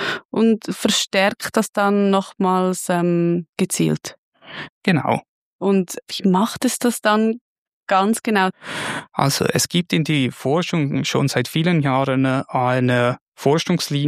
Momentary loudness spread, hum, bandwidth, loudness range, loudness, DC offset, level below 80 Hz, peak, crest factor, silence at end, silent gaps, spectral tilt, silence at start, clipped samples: 7 LU; none; 15.5 kHz; 2 LU; -19 LUFS; under 0.1%; -60 dBFS; -2 dBFS; 18 dB; 0 s; 0.25-0.29 s, 1.69-1.73 s, 3.49-3.53 s, 4.18-4.32 s, 4.69-4.82 s, 5.28-5.59 s, 7.41-7.81 s, 13.21-13.32 s; -5 dB/octave; 0 s; under 0.1%